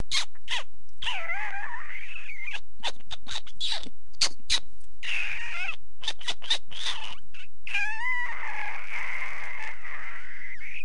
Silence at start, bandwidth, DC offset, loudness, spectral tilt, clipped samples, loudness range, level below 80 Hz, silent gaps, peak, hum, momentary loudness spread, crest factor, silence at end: 0 s; 11.5 kHz; 10%; -32 LUFS; -0.5 dB/octave; under 0.1%; 4 LU; -56 dBFS; none; -8 dBFS; none; 11 LU; 24 dB; 0 s